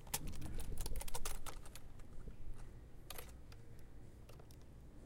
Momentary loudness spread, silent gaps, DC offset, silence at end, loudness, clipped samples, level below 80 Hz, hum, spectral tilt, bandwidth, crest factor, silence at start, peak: 13 LU; none; under 0.1%; 0 s; -52 LUFS; under 0.1%; -48 dBFS; none; -3.5 dB/octave; 16.5 kHz; 18 dB; 0 s; -24 dBFS